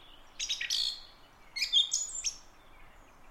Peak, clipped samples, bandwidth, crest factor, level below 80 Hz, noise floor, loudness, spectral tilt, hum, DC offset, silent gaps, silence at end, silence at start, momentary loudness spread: -16 dBFS; under 0.1%; 16 kHz; 20 dB; -58 dBFS; -56 dBFS; -30 LUFS; 3 dB/octave; none; under 0.1%; none; 0 s; 0 s; 17 LU